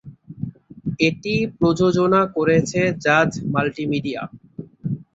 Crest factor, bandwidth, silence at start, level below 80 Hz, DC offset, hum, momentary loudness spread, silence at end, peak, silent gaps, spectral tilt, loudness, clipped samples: 18 dB; 8 kHz; 0.05 s; -52 dBFS; under 0.1%; none; 16 LU; 0.15 s; -2 dBFS; none; -6 dB/octave; -20 LUFS; under 0.1%